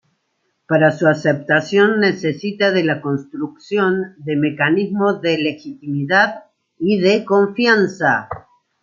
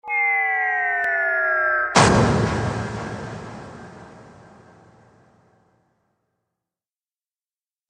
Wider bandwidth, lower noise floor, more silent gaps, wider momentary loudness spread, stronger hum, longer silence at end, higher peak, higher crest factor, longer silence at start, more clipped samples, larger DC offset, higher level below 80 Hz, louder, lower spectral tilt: second, 7.4 kHz vs 10.5 kHz; second, -69 dBFS vs under -90 dBFS; neither; second, 9 LU vs 22 LU; neither; second, 0.4 s vs 3.7 s; about the same, -2 dBFS vs -2 dBFS; second, 16 dB vs 22 dB; first, 0.7 s vs 0.05 s; neither; neither; second, -62 dBFS vs -44 dBFS; about the same, -17 LUFS vs -19 LUFS; first, -6.5 dB/octave vs -4.5 dB/octave